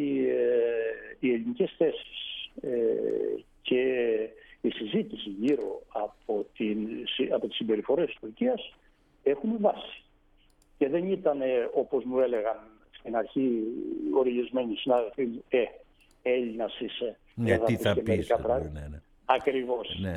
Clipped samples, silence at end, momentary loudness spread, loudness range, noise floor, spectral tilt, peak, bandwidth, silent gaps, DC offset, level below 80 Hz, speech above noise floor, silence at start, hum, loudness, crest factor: under 0.1%; 0 s; 9 LU; 2 LU; -63 dBFS; -7 dB/octave; -8 dBFS; 14 kHz; none; under 0.1%; -56 dBFS; 34 dB; 0 s; none; -29 LUFS; 22 dB